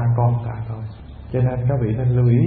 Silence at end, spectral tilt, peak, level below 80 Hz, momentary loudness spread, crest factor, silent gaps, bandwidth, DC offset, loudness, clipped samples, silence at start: 0 s; -14.5 dB/octave; -6 dBFS; -38 dBFS; 14 LU; 14 dB; none; 3.6 kHz; under 0.1%; -21 LUFS; under 0.1%; 0 s